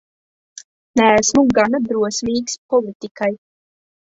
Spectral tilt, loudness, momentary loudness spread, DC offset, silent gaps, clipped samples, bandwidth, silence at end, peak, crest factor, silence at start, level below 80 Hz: -3.5 dB/octave; -17 LUFS; 10 LU; under 0.1%; 2.58-2.69 s, 2.95-3.00 s, 3.11-3.15 s; under 0.1%; 8 kHz; 0.75 s; -2 dBFS; 16 dB; 0.95 s; -50 dBFS